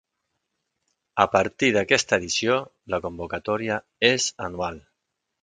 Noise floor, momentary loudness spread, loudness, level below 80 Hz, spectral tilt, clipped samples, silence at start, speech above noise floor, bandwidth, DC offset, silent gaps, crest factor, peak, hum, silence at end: -80 dBFS; 11 LU; -23 LUFS; -54 dBFS; -3 dB/octave; under 0.1%; 1.15 s; 56 dB; 9.6 kHz; under 0.1%; none; 24 dB; 0 dBFS; none; 0.65 s